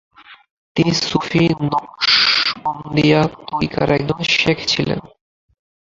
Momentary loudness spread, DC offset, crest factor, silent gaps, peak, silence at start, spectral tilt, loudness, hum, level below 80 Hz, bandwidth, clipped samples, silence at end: 10 LU; under 0.1%; 18 dB; 0.51-0.75 s; -2 dBFS; 0.3 s; -4.5 dB/octave; -16 LUFS; none; -46 dBFS; 7.8 kHz; under 0.1%; 0.85 s